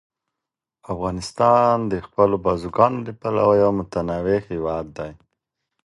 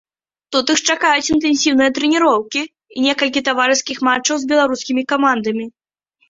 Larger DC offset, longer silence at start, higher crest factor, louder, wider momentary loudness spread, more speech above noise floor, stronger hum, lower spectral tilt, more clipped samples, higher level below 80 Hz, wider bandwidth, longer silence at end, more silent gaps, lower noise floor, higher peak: neither; first, 0.9 s vs 0.5 s; about the same, 20 dB vs 16 dB; second, -20 LUFS vs -16 LUFS; first, 12 LU vs 8 LU; first, 66 dB vs 48 dB; neither; first, -7 dB/octave vs -1.5 dB/octave; neither; first, -46 dBFS vs -56 dBFS; first, 11.5 kHz vs 7.8 kHz; about the same, 0.7 s vs 0.6 s; neither; first, -86 dBFS vs -64 dBFS; about the same, 0 dBFS vs -2 dBFS